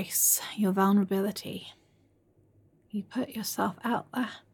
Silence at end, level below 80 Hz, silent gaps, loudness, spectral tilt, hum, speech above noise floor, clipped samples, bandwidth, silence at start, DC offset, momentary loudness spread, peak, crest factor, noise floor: 0.15 s; -74 dBFS; none; -28 LUFS; -4 dB/octave; none; 37 dB; under 0.1%; 17.5 kHz; 0 s; under 0.1%; 16 LU; -12 dBFS; 18 dB; -66 dBFS